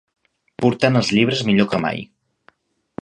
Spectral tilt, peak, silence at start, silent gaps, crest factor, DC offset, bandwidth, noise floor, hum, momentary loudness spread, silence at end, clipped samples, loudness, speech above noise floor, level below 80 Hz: -6 dB/octave; 0 dBFS; 0.6 s; none; 20 dB; under 0.1%; 10 kHz; -57 dBFS; none; 11 LU; 0.95 s; under 0.1%; -18 LUFS; 40 dB; -56 dBFS